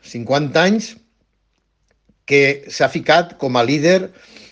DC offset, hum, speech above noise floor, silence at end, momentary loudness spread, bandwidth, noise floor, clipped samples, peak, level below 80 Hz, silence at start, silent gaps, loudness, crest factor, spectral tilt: under 0.1%; none; 50 dB; 0.45 s; 6 LU; 9.4 kHz; -66 dBFS; under 0.1%; 0 dBFS; -62 dBFS; 0.1 s; none; -16 LUFS; 18 dB; -5 dB/octave